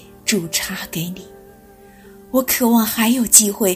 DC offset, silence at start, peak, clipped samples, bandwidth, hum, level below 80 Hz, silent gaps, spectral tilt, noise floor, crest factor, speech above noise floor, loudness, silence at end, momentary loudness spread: under 0.1%; 0.25 s; 0 dBFS; under 0.1%; 16 kHz; none; -50 dBFS; none; -2.5 dB/octave; -45 dBFS; 18 dB; 28 dB; -16 LUFS; 0 s; 16 LU